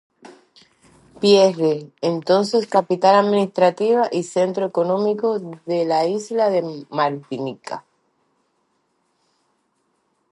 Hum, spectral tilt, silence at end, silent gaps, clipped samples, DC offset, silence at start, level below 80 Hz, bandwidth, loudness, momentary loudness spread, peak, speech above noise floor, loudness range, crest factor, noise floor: none; -5.5 dB/octave; 2.5 s; none; under 0.1%; under 0.1%; 0.25 s; -74 dBFS; 11.5 kHz; -19 LUFS; 13 LU; -2 dBFS; 50 dB; 11 LU; 18 dB; -68 dBFS